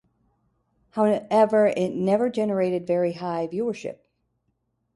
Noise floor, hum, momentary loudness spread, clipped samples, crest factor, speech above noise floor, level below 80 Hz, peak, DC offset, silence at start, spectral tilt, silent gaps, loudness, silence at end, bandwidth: -74 dBFS; none; 10 LU; under 0.1%; 18 dB; 51 dB; -68 dBFS; -6 dBFS; under 0.1%; 0.95 s; -7 dB/octave; none; -23 LUFS; 1 s; 11.5 kHz